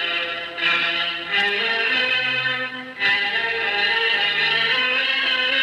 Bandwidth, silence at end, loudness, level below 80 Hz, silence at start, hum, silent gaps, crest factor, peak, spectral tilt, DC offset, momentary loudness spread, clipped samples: 14 kHz; 0 s; -19 LUFS; -66 dBFS; 0 s; none; none; 14 dB; -8 dBFS; -2.5 dB/octave; under 0.1%; 5 LU; under 0.1%